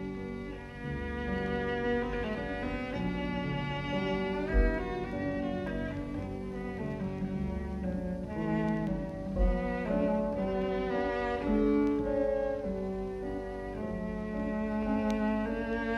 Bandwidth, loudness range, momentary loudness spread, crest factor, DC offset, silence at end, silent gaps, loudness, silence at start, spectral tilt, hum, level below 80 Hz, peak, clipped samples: 11 kHz; 4 LU; 8 LU; 16 dB; under 0.1%; 0 s; none; -33 LUFS; 0 s; -8 dB/octave; none; -40 dBFS; -16 dBFS; under 0.1%